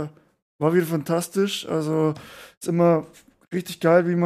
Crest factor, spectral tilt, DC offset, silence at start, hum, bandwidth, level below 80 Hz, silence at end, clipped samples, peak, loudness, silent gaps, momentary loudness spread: 18 dB; -6 dB/octave; under 0.1%; 0 s; none; 15 kHz; -66 dBFS; 0 s; under 0.1%; -6 dBFS; -23 LUFS; 0.42-0.59 s, 2.57-2.61 s; 13 LU